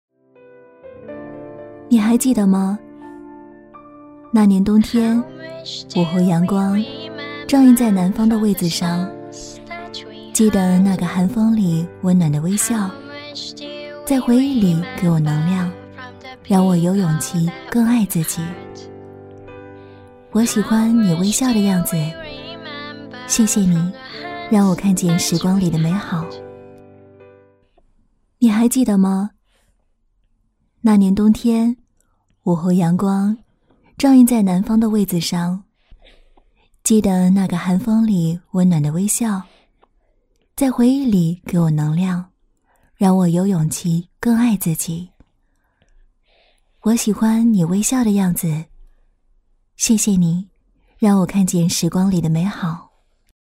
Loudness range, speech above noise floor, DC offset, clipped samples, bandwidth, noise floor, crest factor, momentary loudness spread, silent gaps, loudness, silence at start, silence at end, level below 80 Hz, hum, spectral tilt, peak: 3 LU; 47 dB; under 0.1%; under 0.1%; 16 kHz; -63 dBFS; 16 dB; 18 LU; none; -17 LUFS; 0.85 s; 0.65 s; -48 dBFS; none; -6 dB/octave; -2 dBFS